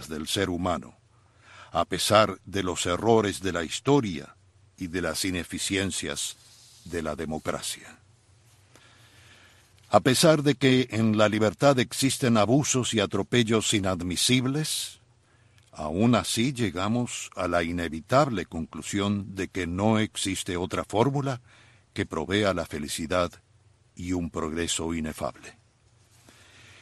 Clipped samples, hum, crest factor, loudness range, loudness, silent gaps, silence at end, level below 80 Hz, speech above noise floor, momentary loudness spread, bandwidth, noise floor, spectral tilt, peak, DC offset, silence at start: under 0.1%; none; 24 dB; 9 LU; -26 LUFS; none; 1.3 s; -54 dBFS; 35 dB; 11 LU; 12.5 kHz; -61 dBFS; -4.5 dB/octave; -4 dBFS; under 0.1%; 0 s